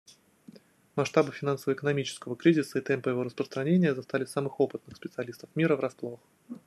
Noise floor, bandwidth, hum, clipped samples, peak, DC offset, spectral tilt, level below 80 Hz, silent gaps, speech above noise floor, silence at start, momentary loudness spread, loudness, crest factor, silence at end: -55 dBFS; 13 kHz; none; under 0.1%; -8 dBFS; under 0.1%; -6.5 dB/octave; -74 dBFS; none; 26 dB; 0.95 s; 14 LU; -29 LUFS; 20 dB; 0.1 s